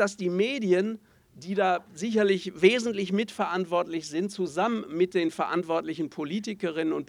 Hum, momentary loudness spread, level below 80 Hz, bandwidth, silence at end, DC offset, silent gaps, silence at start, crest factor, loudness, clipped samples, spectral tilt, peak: none; 9 LU; -70 dBFS; 12 kHz; 0.05 s; under 0.1%; none; 0 s; 20 dB; -27 LUFS; under 0.1%; -5.5 dB/octave; -6 dBFS